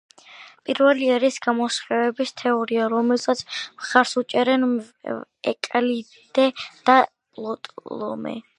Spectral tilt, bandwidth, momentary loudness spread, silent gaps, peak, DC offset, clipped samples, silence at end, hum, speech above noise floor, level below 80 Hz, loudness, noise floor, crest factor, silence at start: -3.5 dB/octave; 11 kHz; 14 LU; none; 0 dBFS; under 0.1%; under 0.1%; 0.15 s; none; 25 dB; -72 dBFS; -22 LUFS; -46 dBFS; 22 dB; 0.3 s